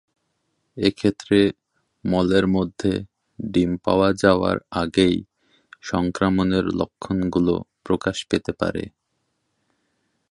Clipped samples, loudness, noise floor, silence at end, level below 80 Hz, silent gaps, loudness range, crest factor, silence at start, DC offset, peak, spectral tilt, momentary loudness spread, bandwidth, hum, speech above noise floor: under 0.1%; -22 LUFS; -74 dBFS; 1.45 s; -46 dBFS; none; 4 LU; 20 dB; 0.75 s; under 0.1%; -2 dBFS; -6.5 dB/octave; 9 LU; 11.5 kHz; none; 53 dB